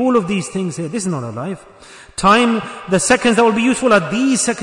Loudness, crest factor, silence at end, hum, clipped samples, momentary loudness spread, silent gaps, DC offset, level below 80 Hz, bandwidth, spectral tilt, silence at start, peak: -15 LUFS; 16 dB; 0 s; none; under 0.1%; 13 LU; none; under 0.1%; -48 dBFS; 11 kHz; -4 dB/octave; 0 s; 0 dBFS